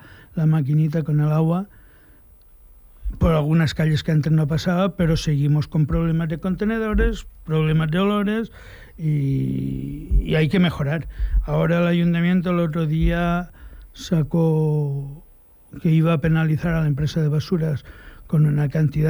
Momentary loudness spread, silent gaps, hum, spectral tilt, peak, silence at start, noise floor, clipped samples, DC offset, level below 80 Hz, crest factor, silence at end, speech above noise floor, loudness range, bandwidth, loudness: 8 LU; none; none; -8 dB/octave; -8 dBFS; 0.05 s; -49 dBFS; under 0.1%; under 0.1%; -32 dBFS; 14 dB; 0 s; 29 dB; 2 LU; over 20 kHz; -21 LUFS